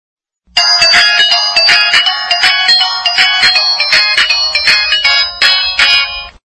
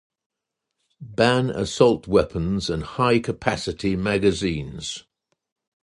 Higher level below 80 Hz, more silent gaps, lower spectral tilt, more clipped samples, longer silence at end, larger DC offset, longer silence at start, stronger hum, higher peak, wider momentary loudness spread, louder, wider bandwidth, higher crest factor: about the same, -44 dBFS vs -44 dBFS; neither; second, 1.5 dB/octave vs -5.5 dB/octave; first, 0.7% vs under 0.1%; second, 0.15 s vs 0.85 s; neither; second, 0.55 s vs 1 s; neither; about the same, 0 dBFS vs -2 dBFS; second, 4 LU vs 12 LU; first, -7 LUFS vs -22 LUFS; about the same, 12 kHz vs 11.5 kHz; second, 10 dB vs 22 dB